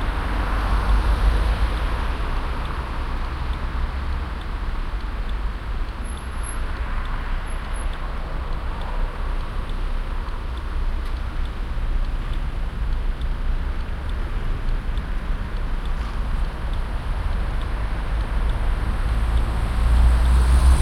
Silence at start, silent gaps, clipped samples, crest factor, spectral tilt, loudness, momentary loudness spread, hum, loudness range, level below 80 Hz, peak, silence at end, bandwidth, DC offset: 0 s; none; under 0.1%; 16 dB; -6 dB/octave; -27 LUFS; 9 LU; none; 6 LU; -22 dBFS; -6 dBFS; 0 s; 12 kHz; under 0.1%